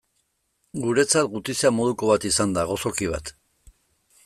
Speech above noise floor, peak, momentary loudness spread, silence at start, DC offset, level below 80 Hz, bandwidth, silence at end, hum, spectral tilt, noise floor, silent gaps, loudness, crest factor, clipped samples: 49 dB; -6 dBFS; 10 LU; 0.75 s; under 0.1%; -50 dBFS; 15 kHz; 0.95 s; none; -3.5 dB/octave; -72 dBFS; none; -22 LUFS; 18 dB; under 0.1%